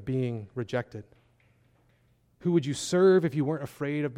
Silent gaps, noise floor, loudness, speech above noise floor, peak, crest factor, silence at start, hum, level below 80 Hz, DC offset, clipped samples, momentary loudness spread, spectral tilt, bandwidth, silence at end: none; -66 dBFS; -27 LUFS; 39 dB; -12 dBFS; 16 dB; 0 s; none; -64 dBFS; under 0.1%; under 0.1%; 13 LU; -6.5 dB/octave; 14 kHz; 0 s